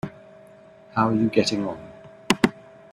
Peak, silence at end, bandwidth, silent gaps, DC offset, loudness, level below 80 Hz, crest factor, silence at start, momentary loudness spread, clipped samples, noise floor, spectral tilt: -2 dBFS; 0.35 s; 14 kHz; none; under 0.1%; -23 LUFS; -58 dBFS; 24 dB; 0.05 s; 17 LU; under 0.1%; -49 dBFS; -5 dB/octave